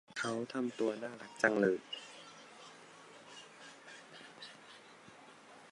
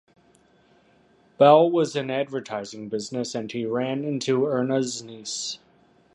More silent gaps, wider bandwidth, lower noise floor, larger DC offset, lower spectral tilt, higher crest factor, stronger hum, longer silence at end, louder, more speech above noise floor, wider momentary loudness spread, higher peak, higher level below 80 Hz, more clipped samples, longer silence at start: neither; about the same, 11.5 kHz vs 11 kHz; about the same, -58 dBFS vs -59 dBFS; neither; about the same, -4.5 dB/octave vs -5 dB/octave; first, 28 dB vs 22 dB; neither; second, 0 s vs 0.6 s; second, -36 LUFS vs -24 LUFS; second, 22 dB vs 36 dB; first, 23 LU vs 16 LU; second, -12 dBFS vs -4 dBFS; second, -84 dBFS vs -72 dBFS; neither; second, 0.1 s vs 1.4 s